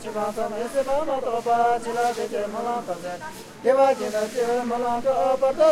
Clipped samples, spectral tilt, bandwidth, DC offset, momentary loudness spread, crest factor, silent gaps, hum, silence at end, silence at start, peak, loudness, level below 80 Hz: under 0.1%; -4 dB/octave; 15.5 kHz; under 0.1%; 9 LU; 16 dB; none; none; 0 s; 0 s; -8 dBFS; -24 LUFS; -54 dBFS